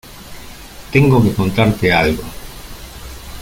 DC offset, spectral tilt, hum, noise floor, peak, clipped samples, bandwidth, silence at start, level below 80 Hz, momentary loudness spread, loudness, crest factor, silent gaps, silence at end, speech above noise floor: under 0.1%; -6.5 dB/octave; none; -34 dBFS; 0 dBFS; under 0.1%; 17 kHz; 0.05 s; -34 dBFS; 23 LU; -14 LUFS; 16 dB; none; 0 s; 21 dB